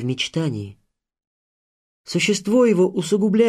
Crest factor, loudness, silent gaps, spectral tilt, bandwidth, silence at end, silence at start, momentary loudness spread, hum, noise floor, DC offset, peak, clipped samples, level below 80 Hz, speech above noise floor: 16 dB; -20 LUFS; 1.27-2.04 s; -5 dB/octave; 13 kHz; 0 s; 0 s; 11 LU; none; under -90 dBFS; under 0.1%; -6 dBFS; under 0.1%; -62 dBFS; over 71 dB